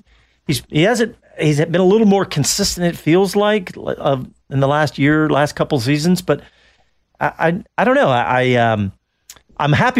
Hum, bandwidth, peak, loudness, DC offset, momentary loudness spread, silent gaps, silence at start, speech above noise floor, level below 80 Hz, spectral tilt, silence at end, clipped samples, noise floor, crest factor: none; 16 kHz; -4 dBFS; -16 LUFS; under 0.1%; 9 LU; none; 0.5 s; 43 dB; -46 dBFS; -5 dB/octave; 0 s; under 0.1%; -58 dBFS; 12 dB